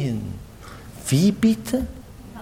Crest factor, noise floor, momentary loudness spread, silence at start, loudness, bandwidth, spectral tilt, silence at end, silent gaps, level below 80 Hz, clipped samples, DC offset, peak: 16 dB; -40 dBFS; 23 LU; 0 s; -22 LUFS; 16.5 kHz; -6 dB/octave; 0 s; none; -42 dBFS; under 0.1%; under 0.1%; -8 dBFS